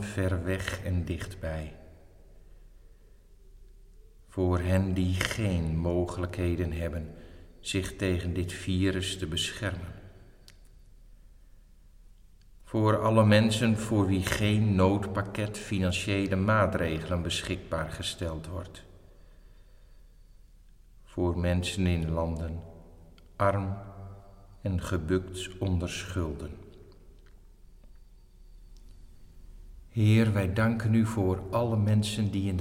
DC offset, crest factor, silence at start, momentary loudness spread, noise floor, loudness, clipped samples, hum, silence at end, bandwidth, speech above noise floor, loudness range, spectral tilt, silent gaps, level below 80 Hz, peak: under 0.1%; 22 dB; 0 s; 16 LU; -54 dBFS; -29 LUFS; under 0.1%; none; 0 s; 15.5 kHz; 27 dB; 12 LU; -6 dB/octave; none; -46 dBFS; -8 dBFS